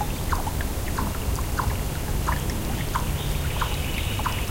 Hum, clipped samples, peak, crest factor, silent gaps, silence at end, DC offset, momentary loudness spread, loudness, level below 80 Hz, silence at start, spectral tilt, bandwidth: none; under 0.1%; -10 dBFS; 16 dB; none; 0 s; under 0.1%; 2 LU; -27 LUFS; -30 dBFS; 0 s; -4.5 dB/octave; 17 kHz